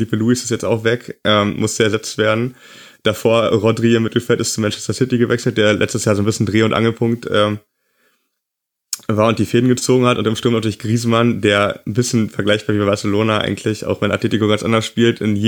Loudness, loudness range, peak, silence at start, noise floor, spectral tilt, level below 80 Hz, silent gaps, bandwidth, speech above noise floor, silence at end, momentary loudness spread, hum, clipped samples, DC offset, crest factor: -16 LUFS; 2 LU; -2 dBFS; 0 s; -80 dBFS; -5 dB/octave; -54 dBFS; none; 19.5 kHz; 64 dB; 0 s; 5 LU; none; under 0.1%; under 0.1%; 16 dB